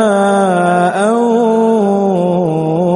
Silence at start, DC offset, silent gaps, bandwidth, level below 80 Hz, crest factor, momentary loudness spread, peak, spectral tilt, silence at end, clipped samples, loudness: 0 s; under 0.1%; none; 11.5 kHz; -54 dBFS; 10 dB; 3 LU; 0 dBFS; -7 dB/octave; 0 s; under 0.1%; -12 LUFS